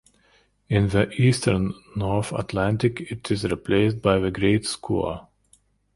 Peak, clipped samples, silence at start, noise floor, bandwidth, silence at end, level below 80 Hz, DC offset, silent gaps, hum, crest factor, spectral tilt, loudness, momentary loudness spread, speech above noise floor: -4 dBFS; under 0.1%; 0.7 s; -61 dBFS; 11.5 kHz; 0.75 s; -44 dBFS; under 0.1%; none; none; 20 dB; -6 dB/octave; -23 LUFS; 8 LU; 39 dB